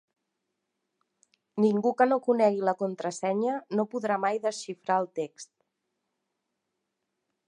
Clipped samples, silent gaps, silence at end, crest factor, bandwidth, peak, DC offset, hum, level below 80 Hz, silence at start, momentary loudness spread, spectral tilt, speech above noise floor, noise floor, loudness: under 0.1%; none; 2.05 s; 22 dB; 11 kHz; -8 dBFS; under 0.1%; none; -86 dBFS; 1.55 s; 12 LU; -5.5 dB/octave; 55 dB; -82 dBFS; -28 LUFS